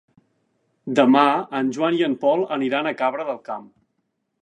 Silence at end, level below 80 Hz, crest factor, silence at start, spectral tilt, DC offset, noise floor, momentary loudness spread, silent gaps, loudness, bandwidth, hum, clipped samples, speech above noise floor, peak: 0.8 s; -74 dBFS; 20 dB; 0.85 s; -6 dB/octave; under 0.1%; -74 dBFS; 15 LU; none; -20 LUFS; 9 kHz; none; under 0.1%; 54 dB; -2 dBFS